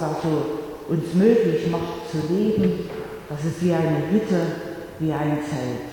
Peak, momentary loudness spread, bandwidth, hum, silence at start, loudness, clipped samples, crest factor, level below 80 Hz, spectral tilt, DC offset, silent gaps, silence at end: -4 dBFS; 11 LU; 19 kHz; none; 0 s; -23 LUFS; under 0.1%; 18 dB; -52 dBFS; -7.5 dB/octave; under 0.1%; none; 0 s